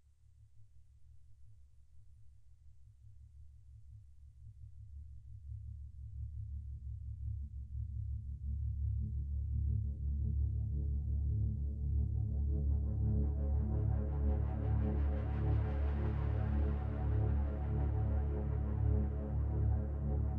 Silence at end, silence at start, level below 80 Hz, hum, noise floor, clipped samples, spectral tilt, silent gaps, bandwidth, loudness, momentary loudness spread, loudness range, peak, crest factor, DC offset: 0 s; 0.4 s; -38 dBFS; none; -63 dBFS; under 0.1%; -11.5 dB/octave; none; 3 kHz; -38 LUFS; 15 LU; 15 LU; -24 dBFS; 14 dB; under 0.1%